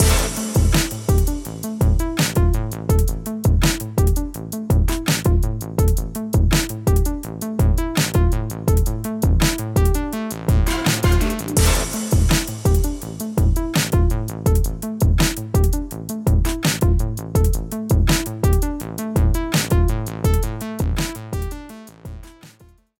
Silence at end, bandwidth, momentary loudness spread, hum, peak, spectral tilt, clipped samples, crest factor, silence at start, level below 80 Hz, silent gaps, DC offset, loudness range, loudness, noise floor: 0.5 s; 19 kHz; 8 LU; none; -4 dBFS; -5 dB/octave; under 0.1%; 16 dB; 0 s; -22 dBFS; none; under 0.1%; 1 LU; -20 LUFS; -50 dBFS